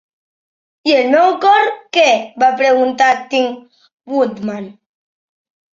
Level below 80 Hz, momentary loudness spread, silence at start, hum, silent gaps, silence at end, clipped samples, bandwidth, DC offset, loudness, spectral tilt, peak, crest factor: -66 dBFS; 13 LU; 0.85 s; none; 3.93-3.98 s; 1.05 s; under 0.1%; 7.6 kHz; under 0.1%; -14 LUFS; -3.5 dB/octave; -2 dBFS; 14 dB